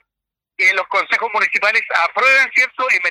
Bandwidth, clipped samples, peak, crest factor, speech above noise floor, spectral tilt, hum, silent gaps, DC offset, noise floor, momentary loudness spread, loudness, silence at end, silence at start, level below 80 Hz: 16 kHz; under 0.1%; -2 dBFS; 16 dB; 68 dB; 0 dB/octave; none; none; under 0.1%; -84 dBFS; 5 LU; -14 LUFS; 0 s; 0.6 s; -72 dBFS